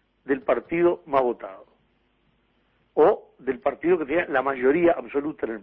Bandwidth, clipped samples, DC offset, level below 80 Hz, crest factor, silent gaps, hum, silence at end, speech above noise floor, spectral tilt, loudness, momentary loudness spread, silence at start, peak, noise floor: 4 kHz; under 0.1%; under 0.1%; -58 dBFS; 18 dB; none; none; 0 s; 43 dB; -10 dB/octave; -24 LUFS; 10 LU; 0.25 s; -8 dBFS; -66 dBFS